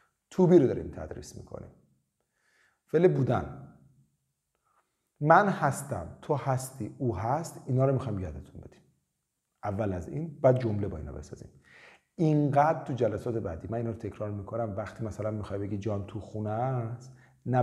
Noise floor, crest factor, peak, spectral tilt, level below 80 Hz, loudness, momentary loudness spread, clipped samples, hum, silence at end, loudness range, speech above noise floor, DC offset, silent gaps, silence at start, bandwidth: -81 dBFS; 24 dB; -6 dBFS; -8 dB/octave; -58 dBFS; -29 LUFS; 20 LU; under 0.1%; none; 0 s; 6 LU; 53 dB; under 0.1%; none; 0.3 s; 14 kHz